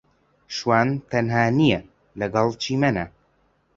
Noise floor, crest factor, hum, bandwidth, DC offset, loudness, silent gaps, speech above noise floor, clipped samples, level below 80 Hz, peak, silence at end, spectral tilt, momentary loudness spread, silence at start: -64 dBFS; 20 dB; none; 7.8 kHz; under 0.1%; -22 LUFS; none; 43 dB; under 0.1%; -52 dBFS; -2 dBFS; 0.7 s; -6 dB/octave; 10 LU; 0.5 s